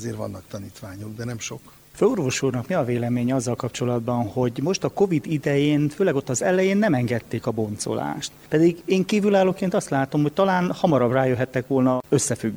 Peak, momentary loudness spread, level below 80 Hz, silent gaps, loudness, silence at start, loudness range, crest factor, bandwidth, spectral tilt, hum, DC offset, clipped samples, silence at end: -6 dBFS; 12 LU; -56 dBFS; none; -22 LUFS; 0 s; 4 LU; 16 dB; over 20 kHz; -6 dB/octave; none; under 0.1%; under 0.1%; 0 s